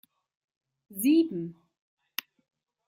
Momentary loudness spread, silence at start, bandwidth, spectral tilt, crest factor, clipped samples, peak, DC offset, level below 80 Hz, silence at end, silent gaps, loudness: 17 LU; 0.9 s; 16.5 kHz; -5 dB/octave; 24 dB; under 0.1%; -8 dBFS; under 0.1%; -78 dBFS; 1.35 s; none; -28 LUFS